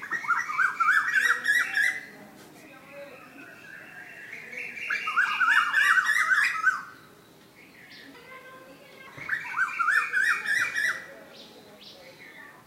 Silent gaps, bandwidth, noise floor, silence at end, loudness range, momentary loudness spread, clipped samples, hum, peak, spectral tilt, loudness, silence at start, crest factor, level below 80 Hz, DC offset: none; 16 kHz; -54 dBFS; 0.15 s; 9 LU; 24 LU; under 0.1%; none; -10 dBFS; 0 dB/octave; -24 LUFS; 0 s; 18 dB; -76 dBFS; under 0.1%